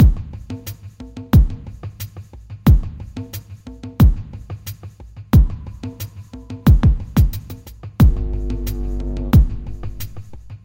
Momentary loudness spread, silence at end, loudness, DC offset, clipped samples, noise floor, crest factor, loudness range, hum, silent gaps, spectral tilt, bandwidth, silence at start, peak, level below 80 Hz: 21 LU; 0.05 s; -17 LUFS; under 0.1%; under 0.1%; -36 dBFS; 16 dB; 3 LU; none; none; -8 dB/octave; 17 kHz; 0 s; -2 dBFS; -20 dBFS